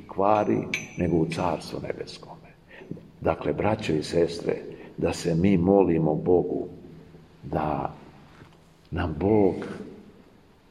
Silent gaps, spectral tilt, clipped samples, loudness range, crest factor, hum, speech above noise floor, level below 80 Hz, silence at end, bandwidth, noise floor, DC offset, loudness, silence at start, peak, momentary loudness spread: none; -7 dB/octave; under 0.1%; 5 LU; 22 dB; none; 30 dB; -50 dBFS; 0.7 s; 12.5 kHz; -55 dBFS; under 0.1%; -25 LUFS; 0 s; -4 dBFS; 18 LU